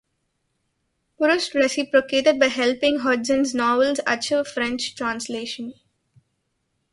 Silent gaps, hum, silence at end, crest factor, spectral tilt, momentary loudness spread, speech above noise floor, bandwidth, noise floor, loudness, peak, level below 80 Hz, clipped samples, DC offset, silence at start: none; none; 1.2 s; 20 dB; -2.5 dB/octave; 10 LU; 52 dB; 11.5 kHz; -73 dBFS; -21 LUFS; -2 dBFS; -62 dBFS; under 0.1%; under 0.1%; 1.2 s